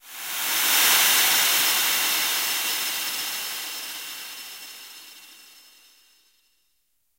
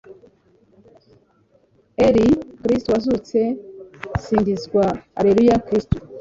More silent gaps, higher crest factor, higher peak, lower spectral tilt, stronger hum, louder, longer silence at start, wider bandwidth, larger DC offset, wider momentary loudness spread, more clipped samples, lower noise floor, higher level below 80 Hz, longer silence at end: neither; about the same, 20 dB vs 18 dB; second, -6 dBFS vs -2 dBFS; second, 2.5 dB/octave vs -7.5 dB/octave; neither; about the same, -20 LUFS vs -19 LUFS; about the same, 0.05 s vs 0.1 s; first, 16 kHz vs 7.8 kHz; neither; first, 21 LU vs 13 LU; neither; first, -72 dBFS vs -59 dBFS; second, -76 dBFS vs -40 dBFS; first, 1.8 s vs 0 s